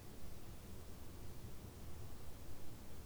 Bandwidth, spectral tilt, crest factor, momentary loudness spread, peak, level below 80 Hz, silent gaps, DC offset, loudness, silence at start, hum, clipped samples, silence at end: over 20 kHz; -5 dB/octave; 12 dB; 2 LU; -36 dBFS; -58 dBFS; none; under 0.1%; -55 LUFS; 0 s; none; under 0.1%; 0 s